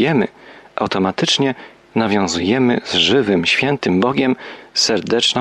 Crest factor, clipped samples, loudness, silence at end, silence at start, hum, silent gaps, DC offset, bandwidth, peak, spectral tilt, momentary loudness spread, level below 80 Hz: 14 dB; under 0.1%; -16 LUFS; 0 s; 0 s; none; none; under 0.1%; 12 kHz; -4 dBFS; -4 dB/octave; 10 LU; -54 dBFS